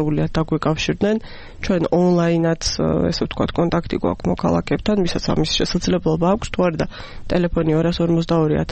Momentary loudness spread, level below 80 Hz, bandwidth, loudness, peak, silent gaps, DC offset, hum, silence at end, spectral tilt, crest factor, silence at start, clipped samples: 5 LU; -34 dBFS; 8.6 kHz; -19 LUFS; -6 dBFS; none; under 0.1%; none; 0 s; -6 dB/octave; 12 dB; 0 s; under 0.1%